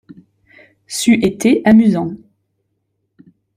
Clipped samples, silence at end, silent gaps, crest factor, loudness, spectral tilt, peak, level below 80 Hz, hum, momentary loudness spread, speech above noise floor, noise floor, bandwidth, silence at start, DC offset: under 0.1%; 1.4 s; none; 14 dB; -14 LUFS; -5.5 dB/octave; -2 dBFS; -52 dBFS; none; 16 LU; 57 dB; -69 dBFS; 15.5 kHz; 0.9 s; under 0.1%